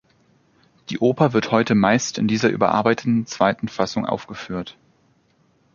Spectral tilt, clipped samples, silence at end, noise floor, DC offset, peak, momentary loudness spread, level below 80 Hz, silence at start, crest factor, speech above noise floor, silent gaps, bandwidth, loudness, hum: -5.5 dB/octave; under 0.1%; 1.05 s; -61 dBFS; under 0.1%; -2 dBFS; 13 LU; -56 dBFS; 0.9 s; 20 dB; 41 dB; none; 7.4 kHz; -20 LUFS; none